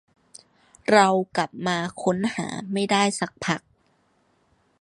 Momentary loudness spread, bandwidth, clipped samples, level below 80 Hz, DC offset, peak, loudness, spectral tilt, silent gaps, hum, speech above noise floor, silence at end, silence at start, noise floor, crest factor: 11 LU; 11.5 kHz; under 0.1%; -64 dBFS; under 0.1%; -2 dBFS; -23 LUFS; -4.5 dB/octave; none; none; 43 dB; 1.25 s; 0.9 s; -65 dBFS; 22 dB